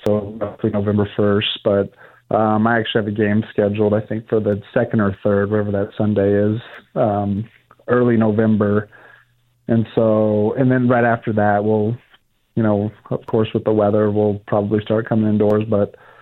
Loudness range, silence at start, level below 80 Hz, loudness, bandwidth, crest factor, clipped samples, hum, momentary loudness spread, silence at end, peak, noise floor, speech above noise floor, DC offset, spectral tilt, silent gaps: 2 LU; 0.05 s; -54 dBFS; -18 LUFS; 4.1 kHz; 16 dB; under 0.1%; none; 8 LU; 0.3 s; -2 dBFS; -57 dBFS; 40 dB; under 0.1%; -9.5 dB/octave; none